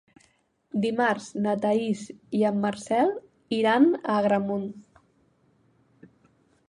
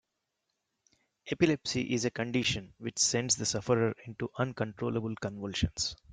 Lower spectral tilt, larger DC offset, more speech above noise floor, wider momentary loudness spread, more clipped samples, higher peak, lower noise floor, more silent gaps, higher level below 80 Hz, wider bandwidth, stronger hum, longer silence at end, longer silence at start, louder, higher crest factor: first, -6 dB/octave vs -3.5 dB/octave; neither; second, 42 dB vs 52 dB; about the same, 11 LU vs 10 LU; neither; first, -8 dBFS vs -12 dBFS; second, -66 dBFS vs -84 dBFS; neither; second, -70 dBFS vs -54 dBFS; about the same, 11 kHz vs 10.5 kHz; neither; first, 1.85 s vs 0 s; second, 0.75 s vs 1.25 s; first, -25 LUFS vs -31 LUFS; about the same, 18 dB vs 20 dB